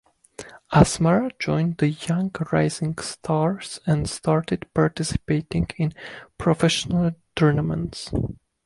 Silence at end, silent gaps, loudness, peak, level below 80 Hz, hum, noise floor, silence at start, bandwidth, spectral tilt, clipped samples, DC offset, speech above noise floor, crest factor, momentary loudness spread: 0.3 s; none; -23 LUFS; -2 dBFS; -42 dBFS; none; -43 dBFS; 0.4 s; 11.5 kHz; -6 dB/octave; under 0.1%; under 0.1%; 21 dB; 20 dB; 9 LU